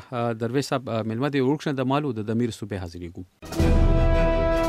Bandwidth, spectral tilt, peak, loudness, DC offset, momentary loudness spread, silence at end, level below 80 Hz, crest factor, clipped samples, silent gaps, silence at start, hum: 13 kHz; -7 dB/octave; -8 dBFS; -25 LUFS; under 0.1%; 12 LU; 0 s; -28 dBFS; 14 dB; under 0.1%; none; 0 s; none